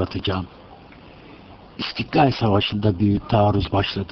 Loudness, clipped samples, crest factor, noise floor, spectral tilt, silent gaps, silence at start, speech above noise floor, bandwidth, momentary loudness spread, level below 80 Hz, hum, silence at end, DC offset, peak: -21 LUFS; under 0.1%; 18 dB; -44 dBFS; -8 dB/octave; none; 0 s; 24 dB; 6.2 kHz; 11 LU; -42 dBFS; none; 0.05 s; under 0.1%; -4 dBFS